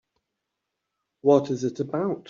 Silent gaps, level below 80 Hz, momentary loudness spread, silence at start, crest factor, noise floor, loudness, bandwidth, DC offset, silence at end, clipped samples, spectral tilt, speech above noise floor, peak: none; -70 dBFS; 7 LU; 1.25 s; 20 dB; -83 dBFS; -24 LUFS; 7.4 kHz; under 0.1%; 0.1 s; under 0.1%; -7.5 dB/octave; 59 dB; -6 dBFS